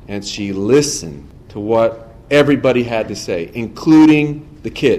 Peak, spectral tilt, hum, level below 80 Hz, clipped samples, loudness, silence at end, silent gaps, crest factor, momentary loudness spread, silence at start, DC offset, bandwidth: -2 dBFS; -5.5 dB/octave; none; -42 dBFS; under 0.1%; -15 LUFS; 0 s; none; 12 dB; 17 LU; 0.1 s; under 0.1%; 13 kHz